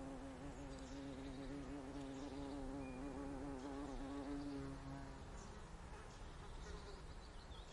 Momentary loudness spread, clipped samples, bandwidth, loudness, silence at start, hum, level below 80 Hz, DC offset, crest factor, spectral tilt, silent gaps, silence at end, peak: 7 LU; under 0.1%; 11.5 kHz; -52 LUFS; 0 s; none; -56 dBFS; under 0.1%; 12 dB; -6 dB/octave; none; 0 s; -38 dBFS